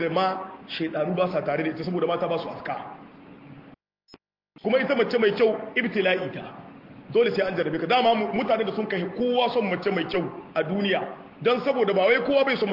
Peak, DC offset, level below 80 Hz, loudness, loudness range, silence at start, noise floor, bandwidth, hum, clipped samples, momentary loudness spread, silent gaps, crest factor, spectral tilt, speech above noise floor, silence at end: -8 dBFS; under 0.1%; -64 dBFS; -25 LUFS; 5 LU; 0 s; -56 dBFS; 5.8 kHz; none; under 0.1%; 13 LU; none; 16 dB; -7.5 dB/octave; 31 dB; 0 s